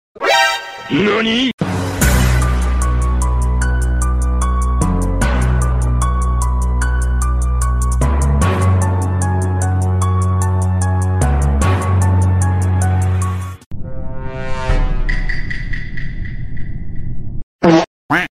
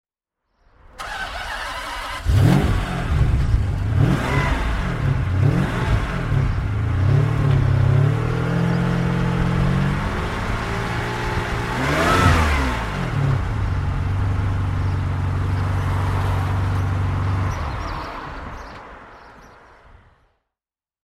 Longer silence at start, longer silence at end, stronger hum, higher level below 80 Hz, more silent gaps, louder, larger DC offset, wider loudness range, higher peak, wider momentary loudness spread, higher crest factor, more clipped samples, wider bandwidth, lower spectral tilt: second, 0.2 s vs 0.95 s; second, 0.1 s vs 1.6 s; neither; first, -18 dBFS vs -28 dBFS; first, 1.53-1.58 s, 13.66-13.71 s, 17.43-17.59 s, 17.87-18.09 s vs none; first, -16 LUFS vs -21 LUFS; neither; about the same, 7 LU vs 5 LU; about the same, 0 dBFS vs -2 dBFS; first, 14 LU vs 10 LU; about the same, 14 dB vs 18 dB; neither; first, 15.5 kHz vs 13.5 kHz; about the same, -5.5 dB/octave vs -6.5 dB/octave